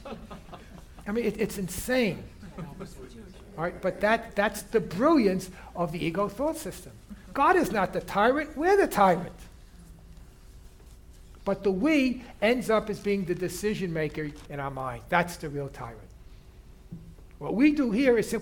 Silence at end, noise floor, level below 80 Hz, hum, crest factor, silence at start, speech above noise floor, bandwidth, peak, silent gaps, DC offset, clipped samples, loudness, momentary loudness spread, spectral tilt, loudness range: 0 s; -50 dBFS; -50 dBFS; none; 20 dB; 0 s; 23 dB; 19 kHz; -8 dBFS; none; under 0.1%; under 0.1%; -27 LUFS; 21 LU; -5.5 dB/octave; 7 LU